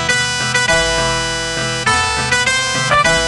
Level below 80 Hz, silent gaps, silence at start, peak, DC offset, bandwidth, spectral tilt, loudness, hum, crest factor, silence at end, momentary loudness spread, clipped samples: -34 dBFS; none; 0 s; 0 dBFS; 0.2%; 12.5 kHz; -2 dB/octave; -14 LUFS; none; 14 dB; 0 s; 5 LU; under 0.1%